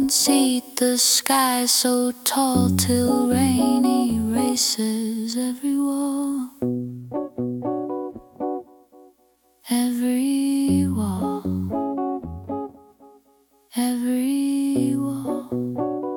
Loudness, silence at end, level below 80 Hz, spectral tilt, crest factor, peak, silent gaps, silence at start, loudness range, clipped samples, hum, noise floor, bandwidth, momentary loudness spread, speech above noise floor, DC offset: -22 LUFS; 0 s; -56 dBFS; -4 dB/octave; 20 dB; -2 dBFS; none; 0 s; 9 LU; under 0.1%; none; -61 dBFS; 18 kHz; 12 LU; 41 dB; under 0.1%